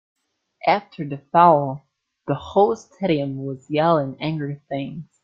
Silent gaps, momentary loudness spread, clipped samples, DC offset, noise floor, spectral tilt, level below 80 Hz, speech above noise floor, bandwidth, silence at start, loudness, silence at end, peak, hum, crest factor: none; 16 LU; under 0.1%; under 0.1%; -42 dBFS; -7.5 dB/octave; -60 dBFS; 21 dB; 7.6 kHz; 0.65 s; -21 LUFS; 0.2 s; -2 dBFS; none; 20 dB